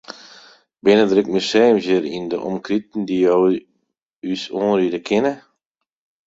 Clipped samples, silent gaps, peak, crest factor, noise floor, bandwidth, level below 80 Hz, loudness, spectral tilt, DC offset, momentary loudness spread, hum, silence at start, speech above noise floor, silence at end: under 0.1%; 4.02-4.10 s, 4.16-4.20 s; -2 dBFS; 18 dB; -78 dBFS; 8 kHz; -62 dBFS; -18 LUFS; -5.5 dB/octave; under 0.1%; 12 LU; none; 0.1 s; 61 dB; 0.9 s